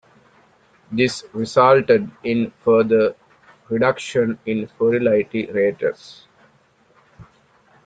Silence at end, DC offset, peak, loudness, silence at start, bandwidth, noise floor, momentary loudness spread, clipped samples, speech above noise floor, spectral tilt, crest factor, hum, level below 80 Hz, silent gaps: 0.65 s; under 0.1%; -2 dBFS; -19 LUFS; 0.9 s; 9.2 kHz; -57 dBFS; 11 LU; under 0.1%; 39 dB; -6 dB/octave; 18 dB; none; -60 dBFS; none